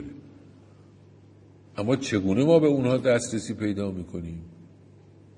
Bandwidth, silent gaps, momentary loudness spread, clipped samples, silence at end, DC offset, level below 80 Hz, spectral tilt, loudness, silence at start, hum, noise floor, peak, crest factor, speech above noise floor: 11 kHz; none; 21 LU; under 0.1%; 0.75 s; under 0.1%; -60 dBFS; -6 dB/octave; -25 LUFS; 0 s; none; -52 dBFS; -8 dBFS; 20 dB; 28 dB